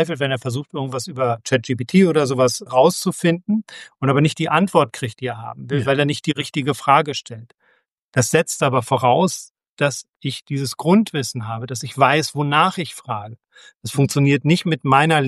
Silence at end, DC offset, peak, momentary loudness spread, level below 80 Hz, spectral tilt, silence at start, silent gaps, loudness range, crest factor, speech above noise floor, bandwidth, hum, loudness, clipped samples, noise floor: 0 s; under 0.1%; 0 dBFS; 12 LU; -62 dBFS; -5 dB/octave; 0 s; 7.99-8.09 s, 9.50-9.55 s, 9.69-9.77 s, 10.16-10.20 s; 3 LU; 18 dB; 44 dB; 13.5 kHz; none; -19 LUFS; under 0.1%; -63 dBFS